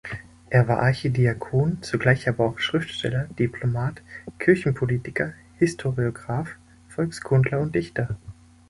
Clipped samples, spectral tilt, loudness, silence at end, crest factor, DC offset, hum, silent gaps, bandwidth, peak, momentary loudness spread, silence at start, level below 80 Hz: under 0.1%; -7 dB/octave; -24 LUFS; 0.4 s; 22 dB; under 0.1%; none; none; 11.5 kHz; -2 dBFS; 10 LU; 0.05 s; -50 dBFS